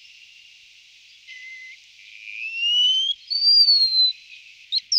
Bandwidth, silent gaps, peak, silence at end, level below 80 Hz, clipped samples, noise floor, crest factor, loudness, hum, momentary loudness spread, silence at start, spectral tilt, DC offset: 15 kHz; none; -8 dBFS; 0 s; -80 dBFS; under 0.1%; -50 dBFS; 16 dB; -16 LUFS; 50 Hz at -80 dBFS; 25 LU; 1.3 s; 7 dB/octave; under 0.1%